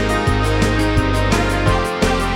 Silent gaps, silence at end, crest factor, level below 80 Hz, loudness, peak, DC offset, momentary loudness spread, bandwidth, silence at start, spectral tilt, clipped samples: none; 0 s; 12 dB; -22 dBFS; -17 LUFS; -4 dBFS; under 0.1%; 1 LU; 16.5 kHz; 0 s; -5.5 dB/octave; under 0.1%